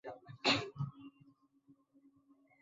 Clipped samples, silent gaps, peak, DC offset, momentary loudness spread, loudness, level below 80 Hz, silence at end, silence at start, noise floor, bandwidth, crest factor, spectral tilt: under 0.1%; none; -16 dBFS; under 0.1%; 25 LU; -36 LUFS; -74 dBFS; 0.9 s; 0.05 s; -70 dBFS; 7.4 kHz; 26 dB; -2.5 dB/octave